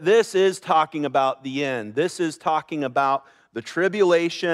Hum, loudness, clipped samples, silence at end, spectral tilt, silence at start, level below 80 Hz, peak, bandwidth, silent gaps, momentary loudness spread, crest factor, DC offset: none; -22 LUFS; under 0.1%; 0 s; -4.5 dB/octave; 0 s; -76 dBFS; -6 dBFS; 12.5 kHz; none; 8 LU; 16 dB; under 0.1%